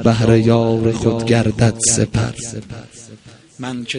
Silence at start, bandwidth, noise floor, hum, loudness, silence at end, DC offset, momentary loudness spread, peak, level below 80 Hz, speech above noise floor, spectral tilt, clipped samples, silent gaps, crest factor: 0 s; 11 kHz; -41 dBFS; none; -15 LUFS; 0 s; under 0.1%; 17 LU; 0 dBFS; -40 dBFS; 26 dB; -5 dB/octave; under 0.1%; none; 16 dB